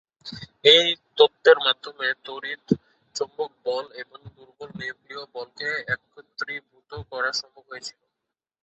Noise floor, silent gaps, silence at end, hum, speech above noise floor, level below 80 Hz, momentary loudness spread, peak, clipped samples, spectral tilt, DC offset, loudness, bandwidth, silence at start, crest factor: -85 dBFS; none; 0.75 s; none; 61 dB; -62 dBFS; 23 LU; 0 dBFS; under 0.1%; -3 dB/octave; under 0.1%; -22 LUFS; 8.2 kHz; 0.25 s; 24 dB